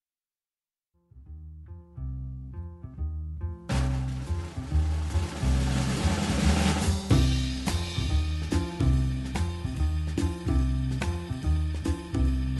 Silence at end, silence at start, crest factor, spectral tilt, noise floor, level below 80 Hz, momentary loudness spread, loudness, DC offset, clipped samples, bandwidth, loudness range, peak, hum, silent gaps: 0 s; 1.15 s; 18 dB; -6 dB/octave; under -90 dBFS; -32 dBFS; 15 LU; -29 LUFS; under 0.1%; under 0.1%; 12 kHz; 9 LU; -10 dBFS; none; none